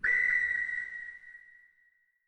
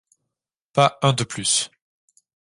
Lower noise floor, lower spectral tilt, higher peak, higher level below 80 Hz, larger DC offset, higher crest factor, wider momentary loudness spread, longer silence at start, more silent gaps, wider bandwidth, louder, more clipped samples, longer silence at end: second, -70 dBFS vs -84 dBFS; second, -2 dB/octave vs -3.5 dB/octave; second, -18 dBFS vs -2 dBFS; about the same, -64 dBFS vs -60 dBFS; neither; second, 16 dB vs 22 dB; first, 22 LU vs 8 LU; second, 0 s vs 0.75 s; neither; second, 8.4 kHz vs 11.5 kHz; second, -29 LUFS vs -21 LUFS; neither; about the same, 0.9 s vs 0.85 s